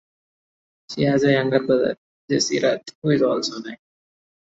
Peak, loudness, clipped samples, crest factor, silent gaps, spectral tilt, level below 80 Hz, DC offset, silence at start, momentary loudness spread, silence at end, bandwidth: -4 dBFS; -21 LUFS; under 0.1%; 18 dB; 1.98-2.28 s, 2.95-3.02 s; -5 dB/octave; -62 dBFS; under 0.1%; 0.9 s; 16 LU; 0.65 s; 8 kHz